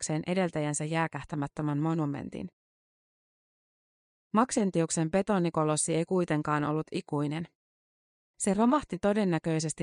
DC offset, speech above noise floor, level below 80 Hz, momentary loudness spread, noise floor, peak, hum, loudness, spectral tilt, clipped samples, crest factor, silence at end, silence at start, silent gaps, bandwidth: under 0.1%; over 61 dB; -62 dBFS; 8 LU; under -90 dBFS; -12 dBFS; none; -29 LUFS; -5.5 dB/octave; under 0.1%; 18 dB; 0 s; 0 s; 2.53-4.30 s, 7.55-8.34 s; 10.5 kHz